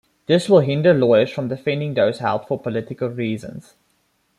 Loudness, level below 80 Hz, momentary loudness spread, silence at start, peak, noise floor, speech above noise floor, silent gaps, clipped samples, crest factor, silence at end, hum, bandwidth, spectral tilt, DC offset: -19 LUFS; -60 dBFS; 11 LU; 0.3 s; -2 dBFS; -65 dBFS; 47 dB; none; under 0.1%; 18 dB; 0.8 s; none; 12 kHz; -7 dB/octave; under 0.1%